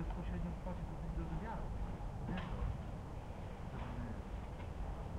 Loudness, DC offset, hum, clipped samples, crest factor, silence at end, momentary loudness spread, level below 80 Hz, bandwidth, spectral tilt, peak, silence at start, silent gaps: -45 LUFS; under 0.1%; none; under 0.1%; 14 dB; 0 s; 5 LU; -46 dBFS; 11 kHz; -7.5 dB/octave; -30 dBFS; 0 s; none